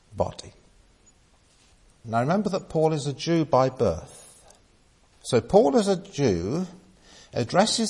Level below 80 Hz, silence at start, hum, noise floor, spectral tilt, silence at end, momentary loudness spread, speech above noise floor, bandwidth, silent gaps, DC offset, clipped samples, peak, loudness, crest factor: -54 dBFS; 0.1 s; none; -59 dBFS; -5.5 dB/octave; 0 s; 15 LU; 36 dB; 11.5 kHz; none; under 0.1%; under 0.1%; -4 dBFS; -24 LUFS; 20 dB